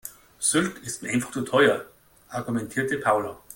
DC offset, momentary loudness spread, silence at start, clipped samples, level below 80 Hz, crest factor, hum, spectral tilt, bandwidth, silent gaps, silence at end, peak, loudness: under 0.1%; 13 LU; 0.05 s; under 0.1%; -62 dBFS; 20 dB; none; -3.5 dB/octave; 17 kHz; none; 0 s; -6 dBFS; -25 LUFS